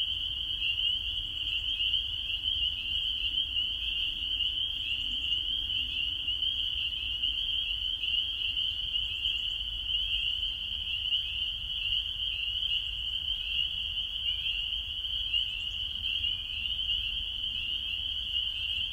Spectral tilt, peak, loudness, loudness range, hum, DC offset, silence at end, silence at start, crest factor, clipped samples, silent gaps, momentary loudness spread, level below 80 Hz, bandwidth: -1.5 dB/octave; -18 dBFS; -29 LUFS; 1 LU; none; under 0.1%; 0 s; 0 s; 14 dB; under 0.1%; none; 3 LU; -48 dBFS; 16 kHz